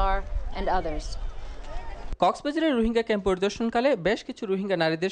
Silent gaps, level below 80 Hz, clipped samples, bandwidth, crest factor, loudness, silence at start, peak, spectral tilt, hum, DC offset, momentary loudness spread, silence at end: none; -34 dBFS; under 0.1%; 9.6 kHz; 16 dB; -26 LUFS; 0 s; -8 dBFS; -5.5 dB/octave; none; under 0.1%; 17 LU; 0 s